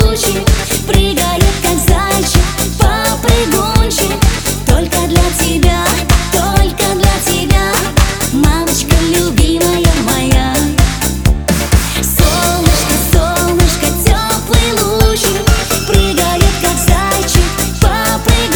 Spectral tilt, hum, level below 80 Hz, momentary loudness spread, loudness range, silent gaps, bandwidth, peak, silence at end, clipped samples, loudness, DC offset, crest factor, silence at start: -4 dB/octave; none; -16 dBFS; 2 LU; 1 LU; none; over 20 kHz; 0 dBFS; 0 s; 0.3%; -12 LUFS; under 0.1%; 10 dB; 0 s